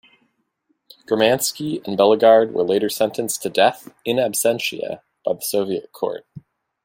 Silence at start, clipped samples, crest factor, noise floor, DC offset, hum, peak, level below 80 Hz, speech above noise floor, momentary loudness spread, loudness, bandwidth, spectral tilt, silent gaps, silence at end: 1.1 s; under 0.1%; 18 dB; -69 dBFS; under 0.1%; none; -2 dBFS; -66 dBFS; 50 dB; 13 LU; -19 LUFS; 16.5 kHz; -3.5 dB/octave; none; 0.45 s